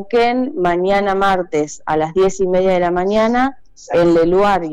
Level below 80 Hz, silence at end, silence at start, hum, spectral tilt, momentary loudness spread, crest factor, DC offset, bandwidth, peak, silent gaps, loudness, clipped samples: -40 dBFS; 0 s; 0 s; none; -5.5 dB/octave; 7 LU; 8 dB; under 0.1%; 10 kHz; -8 dBFS; none; -16 LUFS; under 0.1%